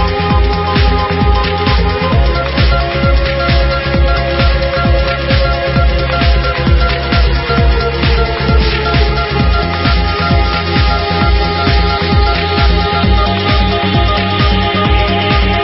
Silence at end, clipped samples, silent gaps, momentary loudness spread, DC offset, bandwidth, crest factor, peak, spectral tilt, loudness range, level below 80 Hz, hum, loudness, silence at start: 0 s; under 0.1%; none; 1 LU; under 0.1%; 5.8 kHz; 10 dB; 0 dBFS; -10 dB/octave; 1 LU; -14 dBFS; none; -12 LUFS; 0 s